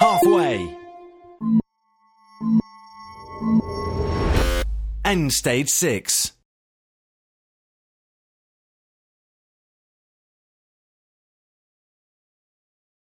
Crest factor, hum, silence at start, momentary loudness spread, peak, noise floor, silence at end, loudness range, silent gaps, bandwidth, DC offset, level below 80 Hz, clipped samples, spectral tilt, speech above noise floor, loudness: 22 dB; none; 0 s; 12 LU; -2 dBFS; -63 dBFS; 6.75 s; 5 LU; none; 17 kHz; under 0.1%; -34 dBFS; under 0.1%; -4 dB/octave; 43 dB; -21 LUFS